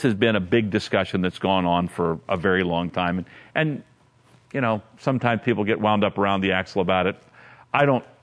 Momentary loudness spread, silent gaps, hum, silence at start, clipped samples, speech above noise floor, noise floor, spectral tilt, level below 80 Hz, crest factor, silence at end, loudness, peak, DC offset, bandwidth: 6 LU; none; none; 0 s; under 0.1%; 34 dB; -56 dBFS; -7 dB/octave; -56 dBFS; 20 dB; 0.2 s; -23 LUFS; -2 dBFS; under 0.1%; 11 kHz